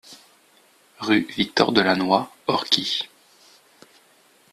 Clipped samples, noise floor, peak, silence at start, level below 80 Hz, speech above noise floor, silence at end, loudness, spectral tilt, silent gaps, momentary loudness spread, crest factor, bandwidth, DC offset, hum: under 0.1%; -57 dBFS; 0 dBFS; 0.1 s; -62 dBFS; 36 dB; 1.45 s; -21 LUFS; -4 dB/octave; none; 8 LU; 24 dB; 14 kHz; under 0.1%; none